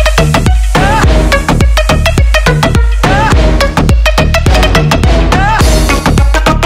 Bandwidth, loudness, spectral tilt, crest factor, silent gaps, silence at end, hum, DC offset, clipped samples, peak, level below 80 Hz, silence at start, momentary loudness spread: 15.5 kHz; -9 LUFS; -5 dB/octave; 6 dB; none; 0 s; none; under 0.1%; 0.4%; 0 dBFS; -10 dBFS; 0 s; 2 LU